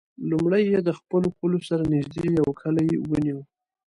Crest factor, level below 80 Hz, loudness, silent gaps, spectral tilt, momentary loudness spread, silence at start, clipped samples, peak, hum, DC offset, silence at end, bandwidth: 14 dB; -52 dBFS; -24 LUFS; none; -8.5 dB/octave; 5 LU; 0.2 s; under 0.1%; -10 dBFS; none; under 0.1%; 0.45 s; 11 kHz